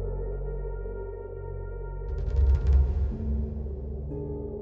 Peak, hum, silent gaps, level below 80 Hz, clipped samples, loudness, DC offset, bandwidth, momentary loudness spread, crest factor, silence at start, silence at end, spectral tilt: -12 dBFS; none; none; -28 dBFS; under 0.1%; -31 LUFS; under 0.1%; 2.5 kHz; 13 LU; 16 dB; 0 s; 0 s; -10.5 dB/octave